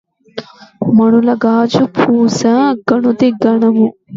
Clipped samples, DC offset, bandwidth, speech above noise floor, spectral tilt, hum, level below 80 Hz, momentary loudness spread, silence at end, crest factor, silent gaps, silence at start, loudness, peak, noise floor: under 0.1%; under 0.1%; 7.6 kHz; 19 dB; -6.5 dB/octave; none; -56 dBFS; 14 LU; 0 s; 12 dB; none; 0.35 s; -12 LUFS; 0 dBFS; -30 dBFS